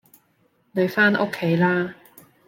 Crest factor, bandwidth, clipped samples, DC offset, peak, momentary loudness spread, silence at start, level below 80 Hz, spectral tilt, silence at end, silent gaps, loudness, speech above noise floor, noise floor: 18 dB; 17 kHz; under 0.1%; under 0.1%; -4 dBFS; 10 LU; 0.75 s; -68 dBFS; -7 dB/octave; 0.55 s; none; -21 LUFS; 44 dB; -64 dBFS